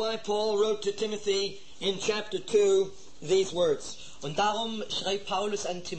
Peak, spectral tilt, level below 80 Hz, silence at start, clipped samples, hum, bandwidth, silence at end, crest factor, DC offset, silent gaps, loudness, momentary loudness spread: -14 dBFS; -3.5 dB/octave; -62 dBFS; 0 s; under 0.1%; none; 8.8 kHz; 0 s; 16 dB; 0.8%; none; -29 LUFS; 9 LU